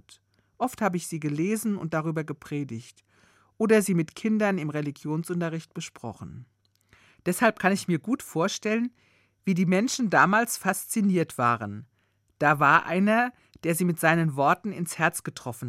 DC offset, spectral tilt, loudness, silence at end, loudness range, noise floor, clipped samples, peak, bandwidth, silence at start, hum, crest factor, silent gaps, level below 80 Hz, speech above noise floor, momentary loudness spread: under 0.1%; -5.5 dB/octave; -26 LUFS; 0 s; 7 LU; -62 dBFS; under 0.1%; -4 dBFS; 16 kHz; 0.6 s; none; 22 dB; none; -70 dBFS; 37 dB; 13 LU